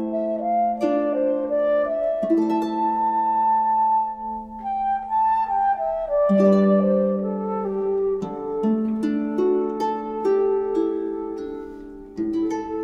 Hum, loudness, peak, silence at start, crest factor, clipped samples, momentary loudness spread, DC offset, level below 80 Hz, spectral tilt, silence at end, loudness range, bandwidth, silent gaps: none; -22 LUFS; -6 dBFS; 0 s; 16 dB; under 0.1%; 10 LU; under 0.1%; -54 dBFS; -9 dB/octave; 0 s; 3 LU; 7.6 kHz; none